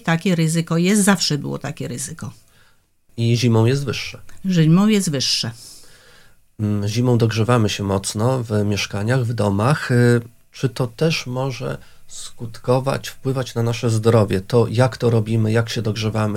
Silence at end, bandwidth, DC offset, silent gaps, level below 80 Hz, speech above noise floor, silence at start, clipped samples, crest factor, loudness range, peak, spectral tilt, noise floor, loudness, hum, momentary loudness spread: 0 s; 15.5 kHz; under 0.1%; none; -50 dBFS; 37 dB; 0.05 s; under 0.1%; 18 dB; 4 LU; 0 dBFS; -5.5 dB/octave; -55 dBFS; -19 LUFS; none; 13 LU